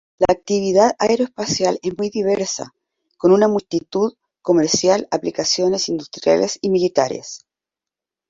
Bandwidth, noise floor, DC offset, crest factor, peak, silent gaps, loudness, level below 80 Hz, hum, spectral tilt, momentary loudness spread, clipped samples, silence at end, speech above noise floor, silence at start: 7.8 kHz; -88 dBFS; under 0.1%; 18 dB; 0 dBFS; none; -18 LUFS; -54 dBFS; none; -4 dB/octave; 9 LU; under 0.1%; 0.95 s; 70 dB; 0.2 s